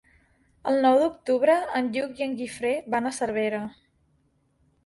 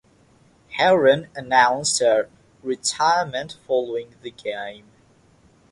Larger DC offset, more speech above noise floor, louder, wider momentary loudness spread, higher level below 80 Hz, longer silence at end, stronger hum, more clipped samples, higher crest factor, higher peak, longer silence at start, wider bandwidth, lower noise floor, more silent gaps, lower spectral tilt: neither; first, 43 dB vs 35 dB; second, -25 LUFS vs -20 LUFS; second, 10 LU vs 16 LU; about the same, -64 dBFS vs -62 dBFS; first, 1.15 s vs 0.95 s; neither; neither; about the same, 18 dB vs 20 dB; second, -8 dBFS vs -4 dBFS; about the same, 0.65 s vs 0.7 s; about the same, 11.5 kHz vs 11.5 kHz; first, -67 dBFS vs -56 dBFS; neither; first, -4.5 dB/octave vs -2.5 dB/octave